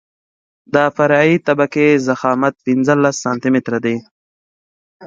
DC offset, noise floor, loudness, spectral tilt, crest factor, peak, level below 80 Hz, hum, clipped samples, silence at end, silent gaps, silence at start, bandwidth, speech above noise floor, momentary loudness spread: under 0.1%; under -90 dBFS; -15 LUFS; -6 dB/octave; 16 dB; 0 dBFS; -62 dBFS; none; under 0.1%; 0 s; 4.11-5.00 s; 0.75 s; 7.8 kHz; over 76 dB; 6 LU